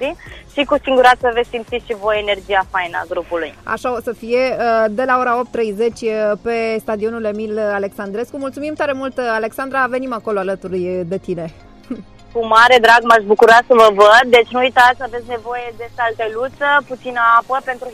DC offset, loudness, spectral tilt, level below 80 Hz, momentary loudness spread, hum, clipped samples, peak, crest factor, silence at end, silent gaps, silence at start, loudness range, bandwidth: under 0.1%; -15 LUFS; -4 dB/octave; -46 dBFS; 15 LU; none; under 0.1%; 0 dBFS; 16 dB; 0 s; none; 0 s; 10 LU; 15.5 kHz